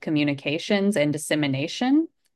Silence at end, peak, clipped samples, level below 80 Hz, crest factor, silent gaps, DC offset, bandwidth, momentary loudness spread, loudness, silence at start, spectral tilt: 0.3 s; -8 dBFS; under 0.1%; -70 dBFS; 14 dB; none; under 0.1%; 12.5 kHz; 3 LU; -23 LUFS; 0 s; -5 dB/octave